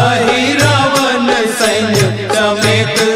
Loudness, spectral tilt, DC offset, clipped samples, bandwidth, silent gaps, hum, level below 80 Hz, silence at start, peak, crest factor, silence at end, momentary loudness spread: -11 LUFS; -4 dB/octave; under 0.1%; under 0.1%; 16 kHz; none; none; -42 dBFS; 0 s; 0 dBFS; 12 dB; 0 s; 3 LU